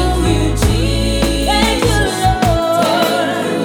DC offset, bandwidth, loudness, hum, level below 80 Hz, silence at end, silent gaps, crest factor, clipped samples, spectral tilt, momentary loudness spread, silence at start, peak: under 0.1%; over 20 kHz; -14 LUFS; none; -20 dBFS; 0 s; none; 14 dB; under 0.1%; -5 dB/octave; 2 LU; 0 s; 0 dBFS